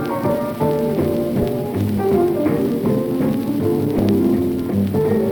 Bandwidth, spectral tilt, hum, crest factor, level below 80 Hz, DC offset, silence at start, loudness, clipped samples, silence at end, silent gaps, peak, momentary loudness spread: over 20 kHz; -8.5 dB/octave; none; 12 dB; -42 dBFS; under 0.1%; 0 s; -19 LUFS; under 0.1%; 0 s; none; -6 dBFS; 4 LU